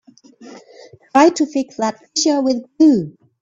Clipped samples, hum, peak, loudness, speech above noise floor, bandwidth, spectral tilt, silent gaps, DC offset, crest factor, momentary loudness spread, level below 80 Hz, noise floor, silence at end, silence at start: under 0.1%; none; 0 dBFS; -16 LUFS; 29 dB; 7.6 kHz; -4 dB/octave; none; under 0.1%; 18 dB; 9 LU; -62 dBFS; -44 dBFS; 0.3 s; 0.4 s